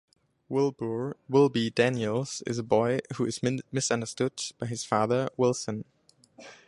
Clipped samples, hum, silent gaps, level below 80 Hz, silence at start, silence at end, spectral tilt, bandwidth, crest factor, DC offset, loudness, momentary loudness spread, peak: under 0.1%; none; none; -66 dBFS; 0.5 s; 0.15 s; -5 dB/octave; 11.5 kHz; 20 dB; under 0.1%; -28 LUFS; 9 LU; -8 dBFS